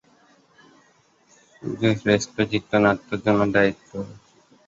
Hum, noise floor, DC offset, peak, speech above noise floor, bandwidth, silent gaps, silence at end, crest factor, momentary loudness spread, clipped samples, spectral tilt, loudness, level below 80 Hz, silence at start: none; -60 dBFS; under 0.1%; -4 dBFS; 38 dB; 7.8 kHz; none; 0.5 s; 20 dB; 15 LU; under 0.1%; -5.5 dB/octave; -21 LUFS; -54 dBFS; 1.6 s